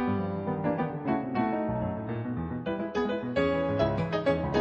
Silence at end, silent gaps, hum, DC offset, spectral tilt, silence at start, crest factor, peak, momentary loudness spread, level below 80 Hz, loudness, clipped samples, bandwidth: 0 s; none; none; under 0.1%; -8.5 dB/octave; 0 s; 16 dB; -14 dBFS; 6 LU; -50 dBFS; -30 LUFS; under 0.1%; 7.8 kHz